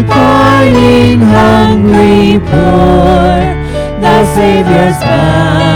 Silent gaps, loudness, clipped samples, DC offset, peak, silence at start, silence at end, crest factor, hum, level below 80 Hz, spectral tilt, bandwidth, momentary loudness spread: none; -7 LUFS; 2%; under 0.1%; 0 dBFS; 0 s; 0 s; 6 dB; none; -20 dBFS; -7 dB/octave; 16.5 kHz; 4 LU